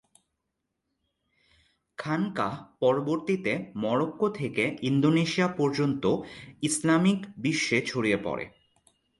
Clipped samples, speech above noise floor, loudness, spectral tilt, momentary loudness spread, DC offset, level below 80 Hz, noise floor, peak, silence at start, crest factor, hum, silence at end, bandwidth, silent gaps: under 0.1%; 55 dB; -27 LUFS; -5.5 dB/octave; 9 LU; under 0.1%; -64 dBFS; -82 dBFS; -10 dBFS; 2 s; 18 dB; none; 0.7 s; 11.5 kHz; none